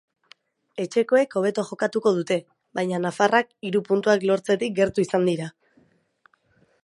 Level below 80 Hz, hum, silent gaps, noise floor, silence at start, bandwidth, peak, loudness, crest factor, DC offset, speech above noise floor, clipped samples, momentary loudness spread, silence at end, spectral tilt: -64 dBFS; none; none; -63 dBFS; 0.75 s; 11.5 kHz; -4 dBFS; -23 LUFS; 20 dB; under 0.1%; 41 dB; under 0.1%; 9 LU; 1.35 s; -5.5 dB/octave